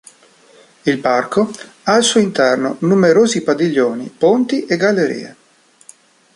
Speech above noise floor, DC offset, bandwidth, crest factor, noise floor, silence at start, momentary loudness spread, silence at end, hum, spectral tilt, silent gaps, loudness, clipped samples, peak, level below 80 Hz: 37 dB; under 0.1%; 11.5 kHz; 14 dB; -52 dBFS; 0.85 s; 9 LU; 1.05 s; none; -4.5 dB/octave; none; -15 LUFS; under 0.1%; -2 dBFS; -60 dBFS